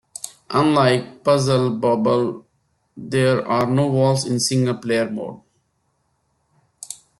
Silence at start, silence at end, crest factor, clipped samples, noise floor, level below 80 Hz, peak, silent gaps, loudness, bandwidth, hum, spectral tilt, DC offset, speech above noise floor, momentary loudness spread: 0.25 s; 0.25 s; 16 dB; under 0.1%; -68 dBFS; -60 dBFS; -4 dBFS; none; -19 LUFS; 12.5 kHz; none; -5.5 dB/octave; under 0.1%; 50 dB; 17 LU